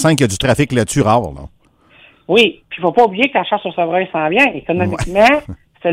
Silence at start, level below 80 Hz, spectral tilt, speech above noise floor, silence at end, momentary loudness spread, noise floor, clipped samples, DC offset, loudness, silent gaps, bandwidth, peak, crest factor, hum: 0 s; -38 dBFS; -5 dB/octave; 35 dB; 0 s; 7 LU; -49 dBFS; under 0.1%; under 0.1%; -14 LUFS; none; 16 kHz; 0 dBFS; 14 dB; none